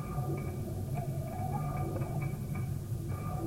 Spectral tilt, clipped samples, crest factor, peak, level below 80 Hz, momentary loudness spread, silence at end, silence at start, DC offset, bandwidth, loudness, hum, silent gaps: -8 dB/octave; under 0.1%; 12 dB; -24 dBFS; -48 dBFS; 3 LU; 0 s; 0 s; under 0.1%; 16 kHz; -37 LUFS; none; none